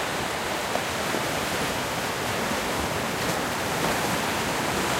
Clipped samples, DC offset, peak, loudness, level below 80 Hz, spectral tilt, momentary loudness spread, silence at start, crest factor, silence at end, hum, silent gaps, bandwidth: under 0.1%; under 0.1%; -12 dBFS; -26 LUFS; -48 dBFS; -3 dB/octave; 2 LU; 0 s; 16 dB; 0 s; none; none; 16 kHz